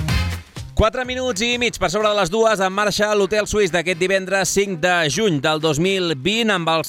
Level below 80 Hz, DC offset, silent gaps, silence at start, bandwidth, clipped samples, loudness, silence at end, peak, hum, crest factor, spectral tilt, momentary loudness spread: -34 dBFS; under 0.1%; none; 0 s; 17 kHz; under 0.1%; -18 LUFS; 0 s; -4 dBFS; none; 14 dB; -4 dB/octave; 4 LU